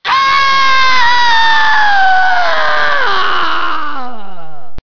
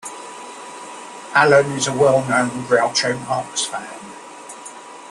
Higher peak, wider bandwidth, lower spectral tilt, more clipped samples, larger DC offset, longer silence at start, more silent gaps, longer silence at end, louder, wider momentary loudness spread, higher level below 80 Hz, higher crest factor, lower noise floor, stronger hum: about the same, 0 dBFS vs -2 dBFS; second, 5.4 kHz vs 12.5 kHz; second, -1.5 dB/octave vs -3.5 dB/octave; neither; first, 30% vs under 0.1%; about the same, 0 s vs 0.05 s; neither; about the same, 0 s vs 0 s; first, -10 LUFS vs -17 LUFS; second, 9 LU vs 21 LU; first, -40 dBFS vs -60 dBFS; second, 12 dB vs 18 dB; about the same, -35 dBFS vs -37 dBFS; neither